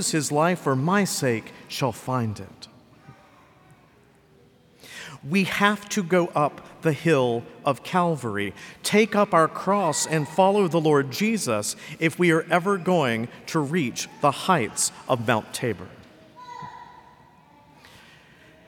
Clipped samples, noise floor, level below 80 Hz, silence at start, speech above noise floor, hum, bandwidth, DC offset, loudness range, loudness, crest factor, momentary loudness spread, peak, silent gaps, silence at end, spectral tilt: under 0.1%; -56 dBFS; -66 dBFS; 0 s; 33 dB; none; 19 kHz; under 0.1%; 11 LU; -23 LUFS; 20 dB; 13 LU; -4 dBFS; none; 1.65 s; -4.5 dB/octave